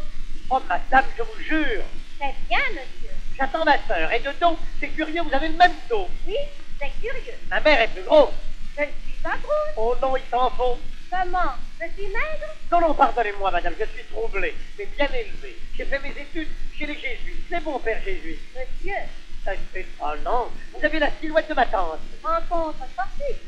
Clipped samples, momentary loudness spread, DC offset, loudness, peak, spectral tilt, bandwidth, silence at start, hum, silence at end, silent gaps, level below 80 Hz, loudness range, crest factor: under 0.1%; 16 LU; under 0.1%; -24 LUFS; -2 dBFS; -5 dB/octave; 6.4 kHz; 0 s; none; 0 s; none; -28 dBFS; 8 LU; 18 dB